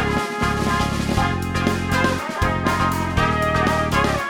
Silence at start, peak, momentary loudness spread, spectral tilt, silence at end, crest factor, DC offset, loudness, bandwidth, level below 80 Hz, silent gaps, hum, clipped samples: 0 s; -4 dBFS; 3 LU; -5.5 dB/octave; 0 s; 16 dB; under 0.1%; -20 LUFS; 17.5 kHz; -32 dBFS; none; none; under 0.1%